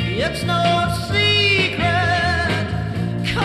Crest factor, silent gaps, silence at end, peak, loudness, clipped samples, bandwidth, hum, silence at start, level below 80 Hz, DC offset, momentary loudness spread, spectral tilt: 14 dB; none; 0 s; -6 dBFS; -18 LUFS; under 0.1%; 14 kHz; none; 0 s; -36 dBFS; under 0.1%; 8 LU; -5 dB/octave